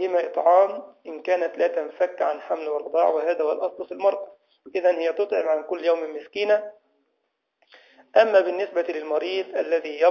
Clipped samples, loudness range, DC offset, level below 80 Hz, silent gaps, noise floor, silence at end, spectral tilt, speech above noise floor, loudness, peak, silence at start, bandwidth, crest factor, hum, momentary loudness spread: under 0.1%; 2 LU; under 0.1%; -80 dBFS; none; -76 dBFS; 0 s; -4 dB/octave; 53 dB; -23 LUFS; -4 dBFS; 0 s; 6.8 kHz; 20 dB; none; 10 LU